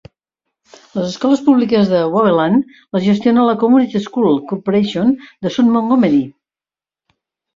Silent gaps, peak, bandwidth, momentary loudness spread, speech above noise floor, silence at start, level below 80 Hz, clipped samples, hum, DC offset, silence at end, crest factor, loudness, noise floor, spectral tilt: none; -2 dBFS; 7.6 kHz; 9 LU; over 76 dB; 0.95 s; -56 dBFS; under 0.1%; none; under 0.1%; 1.25 s; 14 dB; -14 LUFS; under -90 dBFS; -7 dB/octave